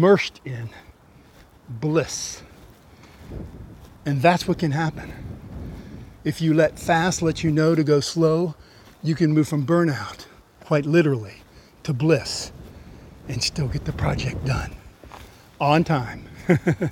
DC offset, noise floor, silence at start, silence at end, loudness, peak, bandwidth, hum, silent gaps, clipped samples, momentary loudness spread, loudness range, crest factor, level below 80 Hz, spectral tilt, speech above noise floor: under 0.1%; -51 dBFS; 0 s; 0 s; -22 LUFS; -2 dBFS; 15.5 kHz; none; none; under 0.1%; 20 LU; 7 LU; 20 dB; -44 dBFS; -6 dB/octave; 29 dB